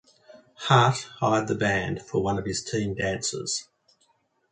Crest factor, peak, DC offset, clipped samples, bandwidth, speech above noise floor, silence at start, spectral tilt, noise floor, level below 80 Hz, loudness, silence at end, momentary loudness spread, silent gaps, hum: 22 dB; -4 dBFS; under 0.1%; under 0.1%; 9.4 kHz; 43 dB; 0.3 s; -4.5 dB/octave; -68 dBFS; -52 dBFS; -25 LUFS; 0.9 s; 10 LU; none; none